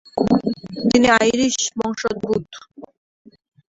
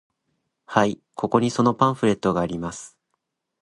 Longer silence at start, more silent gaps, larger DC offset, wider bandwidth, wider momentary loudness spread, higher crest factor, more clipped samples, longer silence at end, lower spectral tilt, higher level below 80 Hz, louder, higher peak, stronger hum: second, 0.15 s vs 0.7 s; neither; neither; second, 8 kHz vs 11 kHz; about the same, 11 LU vs 11 LU; about the same, 20 dB vs 22 dB; neither; about the same, 0.85 s vs 0.75 s; second, -3.5 dB/octave vs -6 dB/octave; about the same, -52 dBFS vs -54 dBFS; first, -19 LUFS vs -22 LUFS; about the same, 0 dBFS vs -2 dBFS; neither